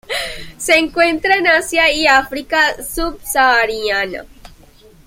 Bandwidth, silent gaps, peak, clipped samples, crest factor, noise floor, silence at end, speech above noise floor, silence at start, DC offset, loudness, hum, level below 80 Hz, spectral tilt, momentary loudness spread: 16.5 kHz; none; 0 dBFS; under 0.1%; 16 dB; -45 dBFS; 0.6 s; 29 dB; 0.1 s; under 0.1%; -14 LUFS; none; -38 dBFS; -1.5 dB/octave; 10 LU